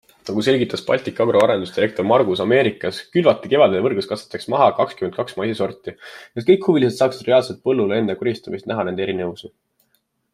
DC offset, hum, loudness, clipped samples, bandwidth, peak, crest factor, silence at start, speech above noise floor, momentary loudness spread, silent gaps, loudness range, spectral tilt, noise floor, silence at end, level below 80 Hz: under 0.1%; none; -19 LUFS; under 0.1%; 13 kHz; -2 dBFS; 18 dB; 0.25 s; 49 dB; 11 LU; none; 3 LU; -6 dB/octave; -67 dBFS; 0.85 s; -62 dBFS